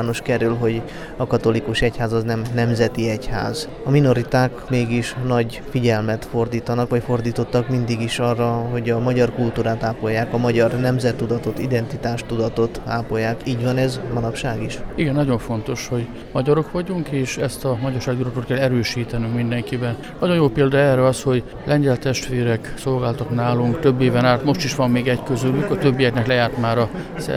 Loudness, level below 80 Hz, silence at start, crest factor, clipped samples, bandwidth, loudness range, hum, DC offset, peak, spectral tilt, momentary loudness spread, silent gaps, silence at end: -20 LUFS; -40 dBFS; 0 s; 18 dB; under 0.1%; 14.5 kHz; 4 LU; none; under 0.1%; -2 dBFS; -6.5 dB/octave; 7 LU; none; 0 s